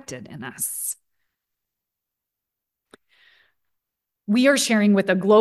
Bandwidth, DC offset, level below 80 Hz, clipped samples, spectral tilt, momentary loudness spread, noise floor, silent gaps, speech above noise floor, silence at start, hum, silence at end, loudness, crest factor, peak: 12.5 kHz; under 0.1%; -72 dBFS; under 0.1%; -4 dB/octave; 19 LU; -84 dBFS; none; 65 dB; 0.1 s; none; 0 s; -20 LUFS; 18 dB; -6 dBFS